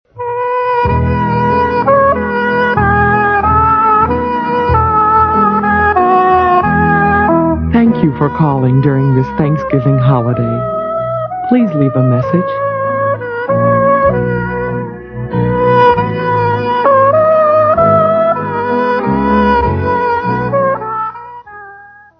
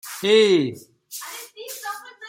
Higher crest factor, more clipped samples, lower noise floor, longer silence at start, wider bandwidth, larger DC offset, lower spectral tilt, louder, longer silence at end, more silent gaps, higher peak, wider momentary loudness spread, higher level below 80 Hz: second, 12 dB vs 18 dB; neither; about the same, -37 dBFS vs -37 dBFS; about the same, 0.15 s vs 0.05 s; second, 6 kHz vs 17 kHz; neither; first, -10 dB/octave vs -4 dB/octave; first, -11 LUFS vs -19 LUFS; first, 0.35 s vs 0 s; neither; first, 0 dBFS vs -4 dBFS; second, 8 LU vs 19 LU; first, -30 dBFS vs -72 dBFS